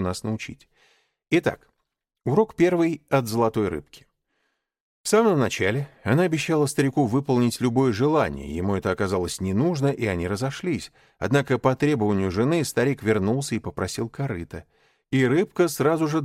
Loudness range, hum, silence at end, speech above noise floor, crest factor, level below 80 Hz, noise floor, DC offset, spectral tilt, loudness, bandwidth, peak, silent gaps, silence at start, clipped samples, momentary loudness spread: 3 LU; none; 0 s; 56 dB; 18 dB; -54 dBFS; -79 dBFS; under 0.1%; -6 dB/octave; -23 LUFS; 16 kHz; -6 dBFS; 4.80-5.04 s; 0 s; under 0.1%; 9 LU